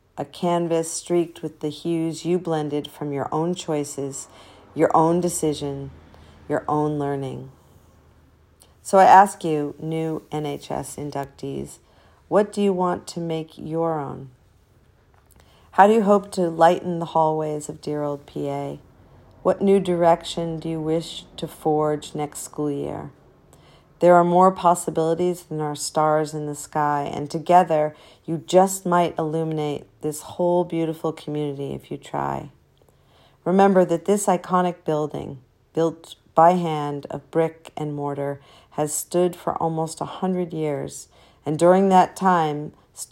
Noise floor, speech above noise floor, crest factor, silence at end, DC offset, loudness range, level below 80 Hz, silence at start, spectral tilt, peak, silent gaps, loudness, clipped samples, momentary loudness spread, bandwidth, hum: -57 dBFS; 36 dB; 22 dB; 0.05 s; under 0.1%; 6 LU; -58 dBFS; 0.15 s; -5.5 dB/octave; 0 dBFS; none; -22 LUFS; under 0.1%; 15 LU; 16 kHz; none